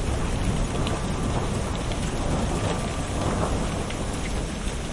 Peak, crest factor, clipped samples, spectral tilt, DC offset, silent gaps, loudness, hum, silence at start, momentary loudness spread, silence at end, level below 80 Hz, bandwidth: -10 dBFS; 16 dB; under 0.1%; -5 dB/octave; under 0.1%; none; -27 LUFS; none; 0 s; 3 LU; 0 s; -30 dBFS; 11.5 kHz